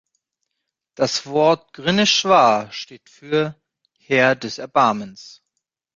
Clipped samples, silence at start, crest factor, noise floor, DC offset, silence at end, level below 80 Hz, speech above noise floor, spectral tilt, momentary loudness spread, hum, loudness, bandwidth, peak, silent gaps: under 0.1%; 1 s; 20 dB; -79 dBFS; under 0.1%; 0.65 s; -62 dBFS; 60 dB; -3.5 dB/octave; 15 LU; none; -18 LUFS; 7.6 kHz; -2 dBFS; none